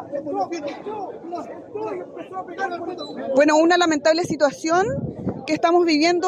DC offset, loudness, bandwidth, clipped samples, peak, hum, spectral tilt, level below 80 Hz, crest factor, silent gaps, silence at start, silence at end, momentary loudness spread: under 0.1%; -21 LUFS; 11.5 kHz; under 0.1%; -6 dBFS; none; -4.5 dB/octave; -58 dBFS; 16 dB; none; 0 s; 0 s; 16 LU